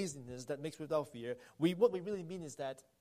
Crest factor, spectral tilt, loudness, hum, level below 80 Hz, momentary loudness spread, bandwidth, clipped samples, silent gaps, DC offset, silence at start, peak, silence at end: 20 dB; -5.5 dB/octave; -39 LUFS; none; -76 dBFS; 13 LU; 15 kHz; under 0.1%; none; under 0.1%; 0 s; -18 dBFS; 0.2 s